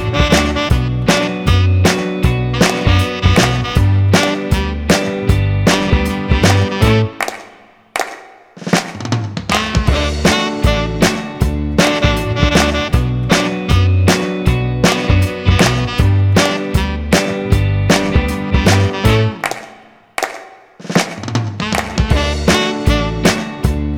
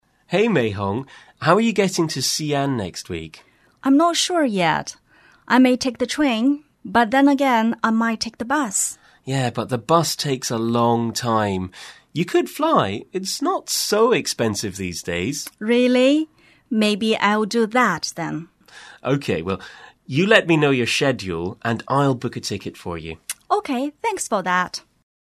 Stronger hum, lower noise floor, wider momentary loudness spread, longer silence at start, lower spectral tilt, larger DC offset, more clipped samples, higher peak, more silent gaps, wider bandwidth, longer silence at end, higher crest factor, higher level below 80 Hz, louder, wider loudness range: neither; about the same, -43 dBFS vs -45 dBFS; second, 8 LU vs 13 LU; second, 0 s vs 0.3 s; about the same, -5 dB/octave vs -4.5 dB/octave; neither; neither; about the same, 0 dBFS vs 0 dBFS; neither; first, 16.5 kHz vs 13.5 kHz; second, 0 s vs 0.45 s; second, 14 dB vs 20 dB; first, -22 dBFS vs -56 dBFS; first, -14 LUFS vs -20 LUFS; about the same, 4 LU vs 3 LU